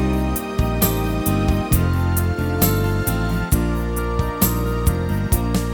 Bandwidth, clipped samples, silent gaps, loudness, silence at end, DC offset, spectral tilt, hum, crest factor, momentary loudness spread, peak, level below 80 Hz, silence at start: over 20 kHz; under 0.1%; none; -20 LUFS; 0 s; under 0.1%; -6 dB/octave; none; 16 dB; 4 LU; -2 dBFS; -24 dBFS; 0 s